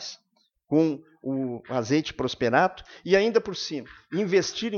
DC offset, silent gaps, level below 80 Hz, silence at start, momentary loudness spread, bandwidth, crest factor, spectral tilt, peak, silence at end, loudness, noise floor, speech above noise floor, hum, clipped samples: under 0.1%; none; -60 dBFS; 0 s; 11 LU; 7.2 kHz; 20 dB; -5 dB/octave; -6 dBFS; 0 s; -26 LUFS; -70 dBFS; 45 dB; none; under 0.1%